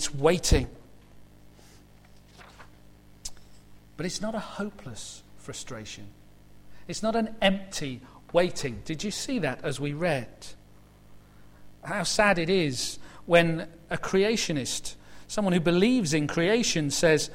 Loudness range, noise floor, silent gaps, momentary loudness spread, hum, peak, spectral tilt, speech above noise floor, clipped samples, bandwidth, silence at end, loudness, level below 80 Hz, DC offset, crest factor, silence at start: 12 LU; -53 dBFS; none; 19 LU; 50 Hz at -55 dBFS; -6 dBFS; -4 dB/octave; 26 dB; under 0.1%; 16.5 kHz; 0 s; -27 LUFS; -44 dBFS; under 0.1%; 22 dB; 0 s